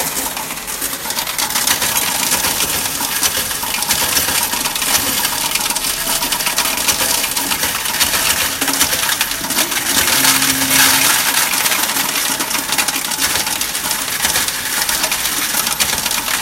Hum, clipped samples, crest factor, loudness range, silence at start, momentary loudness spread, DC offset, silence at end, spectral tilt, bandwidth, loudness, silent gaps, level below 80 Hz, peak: none; under 0.1%; 16 dB; 3 LU; 0 s; 6 LU; under 0.1%; 0 s; 0 dB/octave; 17 kHz; -14 LUFS; none; -42 dBFS; 0 dBFS